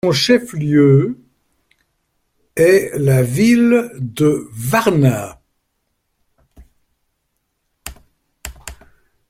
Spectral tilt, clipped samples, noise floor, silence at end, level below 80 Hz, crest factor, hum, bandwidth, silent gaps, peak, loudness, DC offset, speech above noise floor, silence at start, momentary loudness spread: -6 dB/octave; under 0.1%; -70 dBFS; 0.55 s; -48 dBFS; 16 dB; none; 16.5 kHz; none; 0 dBFS; -15 LUFS; under 0.1%; 57 dB; 0.05 s; 23 LU